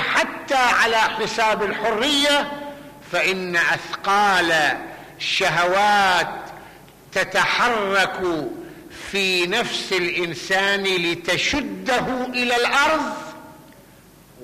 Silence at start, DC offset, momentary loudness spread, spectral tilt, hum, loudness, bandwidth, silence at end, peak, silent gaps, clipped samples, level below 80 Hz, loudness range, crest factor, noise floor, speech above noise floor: 0 s; under 0.1%; 13 LU; -2.5 dB/octave; none; -19 LUFS; 15 kHz; 0 s; -8 dBFS; none; under 0.1%; -52 dBFS; 2 LU; 12 dB; -48 dBFS; 28 dB